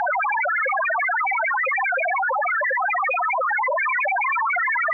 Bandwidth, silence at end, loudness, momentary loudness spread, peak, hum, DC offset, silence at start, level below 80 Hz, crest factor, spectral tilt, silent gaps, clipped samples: 6.4 kHz; 0 s; -21 LUFS; 1 LU; -18 dBFS; none; under 0.1%; 0 s; under -90 dBFS; 4 dB; -1 dB/octave; none; under 0.1%